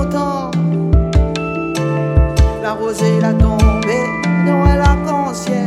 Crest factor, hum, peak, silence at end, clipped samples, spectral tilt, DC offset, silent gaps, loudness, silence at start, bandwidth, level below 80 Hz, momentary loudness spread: 14 dB; none; 0 dBFS; 0 s; under 0.1%; -7 dB/octave; under 0.1%; none; -15 LUFS; 0 s; 12 kHz; -18 dBFS; 6 LU